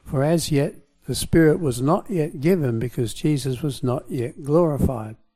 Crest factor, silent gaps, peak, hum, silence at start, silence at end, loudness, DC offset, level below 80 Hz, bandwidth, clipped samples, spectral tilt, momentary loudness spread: 16 dB; none; -6 dBFS; none; 0.05 s; 0.2 s; -22 LUFS; under 0.1%; -42 dBFS; 15.5 kHz; under 0.1%; -6.5 dB/octave; 10 LU